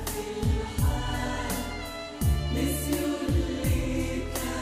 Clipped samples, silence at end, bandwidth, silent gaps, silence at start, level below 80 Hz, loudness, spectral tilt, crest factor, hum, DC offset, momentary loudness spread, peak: under 0.1%; 0 s; 16 kHz; none; 0 s; -32 dBFS; -29 LUFS; -5.5 dB/octave; 14 dB; none; under 0.1%; 5 LU; -14 dBFS